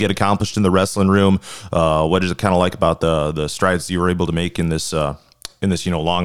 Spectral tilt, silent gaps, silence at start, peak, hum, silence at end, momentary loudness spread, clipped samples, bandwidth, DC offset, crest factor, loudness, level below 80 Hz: -5.5 dB/octave; none; 0 s; -2 dBFS; none; 0 s; 6 LU; under 0.1%; 14.5 kHz; 1%; 16 dB; -18 LUFS; -42 dBFS